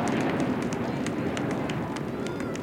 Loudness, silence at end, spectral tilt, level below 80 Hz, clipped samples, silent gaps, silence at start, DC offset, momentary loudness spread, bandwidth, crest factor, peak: -29 LUFS; 0 s; -6 dB/octave; -54 dBFS; under 0.1%; none; 0 s; under 0.1%; 5 LU; 17 kHz; 16 dB; -12 dBFS